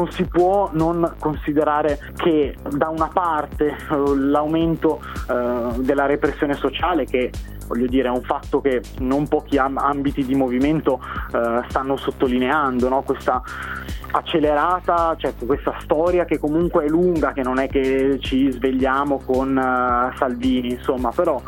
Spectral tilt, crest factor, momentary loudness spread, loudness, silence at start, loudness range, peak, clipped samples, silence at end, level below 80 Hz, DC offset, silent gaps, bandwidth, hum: -7 dB/octave; 16 dB; 5 LU; -20 LUFS; 0 s; 2 LU; -4 dBFS; under 0.1%; 0 s; -36 dBFS; under 0.1%; none; 17 kHz; none